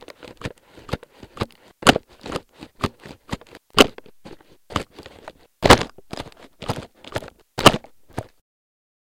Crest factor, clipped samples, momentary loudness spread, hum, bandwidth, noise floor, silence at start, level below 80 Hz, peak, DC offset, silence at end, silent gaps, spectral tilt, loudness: 24 dB; under 0.1%; 21 LU; none; 17 kHz; -45 dBFS; 0.25 s; -40 dBFS; 0 dBFS; under 0.1%; 0.85 s; none; -4 dB/octave; -20 LUFS